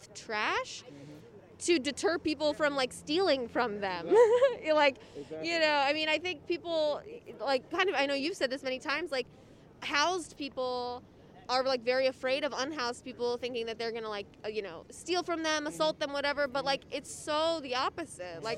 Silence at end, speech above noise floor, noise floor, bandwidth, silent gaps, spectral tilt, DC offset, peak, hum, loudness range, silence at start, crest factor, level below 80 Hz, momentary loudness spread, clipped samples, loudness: 0 s; 21 dB; -52 dBFS; 13.5 kHz; none; -3 dB/octave; under 0.1%; -12 dBFS; none; 6 LU; 0 s; 20 dB; -66 dBFS; 13 LU; under 0.1%; -31 LUFS